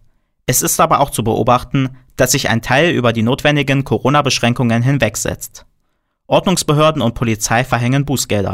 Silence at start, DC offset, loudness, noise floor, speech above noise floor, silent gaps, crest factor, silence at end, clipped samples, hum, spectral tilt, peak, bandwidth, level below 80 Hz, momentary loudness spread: 0.5 s; under 0.1%; -14 LUFS; -65 dBFS; 51 dB; none; 12 dB; 0 s; under 0.1%; none; -4.5 dB/octave; -2 dBFS; 16 kHz; -38 dBFS; 6 LU